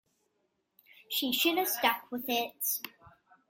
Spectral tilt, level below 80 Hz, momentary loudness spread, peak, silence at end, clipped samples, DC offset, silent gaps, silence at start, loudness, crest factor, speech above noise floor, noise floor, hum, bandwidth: -1 dB/octave; -78 dBFS; 8 LU; -12 dBFS; 0.4 s; under 0.1%; under 0.1%; none; 1.1 s; -30 LUFS; 24 dB; 47 dB; -78 dBFS; none; 17 kHz